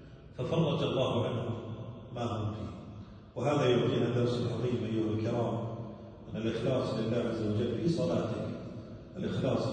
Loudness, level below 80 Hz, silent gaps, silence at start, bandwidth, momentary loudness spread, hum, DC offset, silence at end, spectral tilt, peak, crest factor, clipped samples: -33 LUFS; -58 dBFS; none; 0 s; 9.2 kHz; 15 LU; none; under 0.1%; 0 s; -7.5 dB/octave; -14 dBFS; 18 dB; under 0.1%